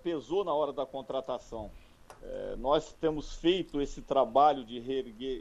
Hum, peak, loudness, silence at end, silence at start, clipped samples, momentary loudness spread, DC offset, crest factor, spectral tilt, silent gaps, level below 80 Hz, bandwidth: none; -12 dBFS; -31 LUFS; 0 s; 0.05 s; under 0.1%; 15 LU; under 0.1%; 20 dB; -5.5 dB/octave; none; -50 dBFS; 11.5 kHz